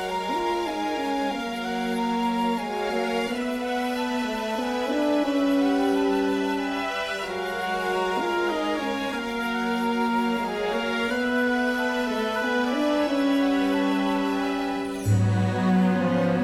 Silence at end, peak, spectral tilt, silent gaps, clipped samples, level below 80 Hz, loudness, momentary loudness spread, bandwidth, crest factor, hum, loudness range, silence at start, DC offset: 0 s; -12 dBFS; -6 dB/octave; none; under 0.1%; -54 dBFS; -25 LUFS; 5 LU; 16 kHz; 14 dB; none; 3 LU; 0 s; under 0.1%